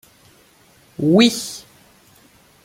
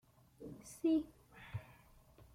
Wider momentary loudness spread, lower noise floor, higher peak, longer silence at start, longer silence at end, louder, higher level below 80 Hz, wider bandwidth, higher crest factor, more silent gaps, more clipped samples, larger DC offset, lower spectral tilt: about the same, 23 LU vs 22 LU; second, -53 dBFS vs -64 dBFS; first, -2 dBFS vs -26 dBFS; first, 1 s vs 0.4 s; first, 1.05 s vs 0.7 s; first, -17 LUFS vs -40 LUFS; first, -62 dBFS vs -68 dBFS; about the same, 16.5 kHz vs 15.5 kHz; about the same, 20 dB vs 18 dB; neither; neither; neither; second, -4.5 dB/octave vs -6.5 dB/octave